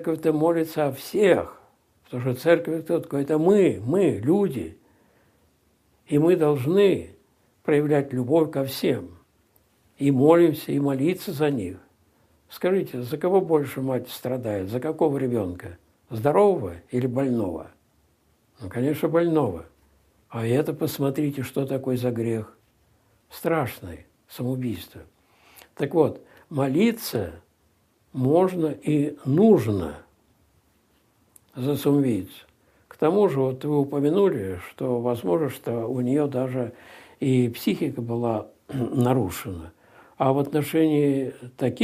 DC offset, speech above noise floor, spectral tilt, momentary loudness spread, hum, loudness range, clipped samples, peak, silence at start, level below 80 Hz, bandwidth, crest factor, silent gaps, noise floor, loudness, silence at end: under 0.1%; 42 dB; -7.5 dB/octave; 14 LU; none; 5 LU; under 0.1%; -4 dBFS; 0 s; -62 dBFS; 15.5 kHz; 20 dB; none; -65 dBFS; -24 LUFS; 0 s